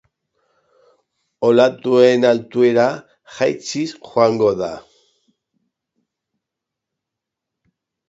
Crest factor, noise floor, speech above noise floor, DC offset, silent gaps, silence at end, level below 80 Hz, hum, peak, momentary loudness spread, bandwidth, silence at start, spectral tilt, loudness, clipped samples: 20 dB; -83 dBFS; 67 dB; under 0.1%; none; 3.3 s; -62 dBFS; none; 0 dBFS; 12 LU; 8 kHz; 1.4 s; -5.5 dB/octave; -16 LUFS; under 0.1%